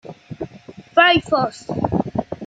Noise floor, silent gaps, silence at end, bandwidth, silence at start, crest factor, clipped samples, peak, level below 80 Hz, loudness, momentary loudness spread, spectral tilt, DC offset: -41 dBFS; none; 0 s; 9.2 kHz; 0.05 s; 18 dB; under 0.1%; -2 dBFS; -48 dBFS; -18 LUFS; 20 LU; -5.5 dB/octave; under 0.1%